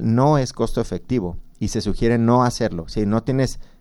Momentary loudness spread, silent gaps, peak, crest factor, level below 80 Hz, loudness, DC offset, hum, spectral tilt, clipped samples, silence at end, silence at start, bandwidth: 9 LU; none; -4 dBFS; 16 dB; -34 dBFS; -21 LUFS; under 0.1%; none; -6.5 dB/octave; under 0.1%; 0.15 s; 0 s; 12.5 kHz